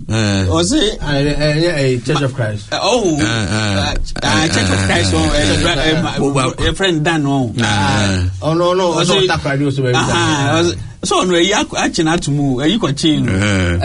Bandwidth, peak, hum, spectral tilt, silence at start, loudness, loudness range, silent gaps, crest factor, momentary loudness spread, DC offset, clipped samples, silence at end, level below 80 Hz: 11 kHz; -2 dBFS; none; -4.5 dB/octave; 0 s; -14 LUFS; 1 LU; none; 14 dB; 4 LU; under 0.1%; under 0.1%; 0 s; -30 dBFS